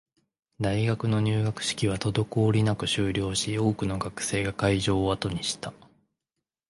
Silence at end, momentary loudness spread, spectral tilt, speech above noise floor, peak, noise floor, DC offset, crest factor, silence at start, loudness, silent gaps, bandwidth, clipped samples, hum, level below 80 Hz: 0.95 s; 6 LU; -5 dB/octave; 60 dB; -10 dBFS; -86 dBFS; under 0.1%; 18 dB; 0.6 s; -27 LUFS; none; 11.5 kHz; under 0.1%; none; -48 dBFS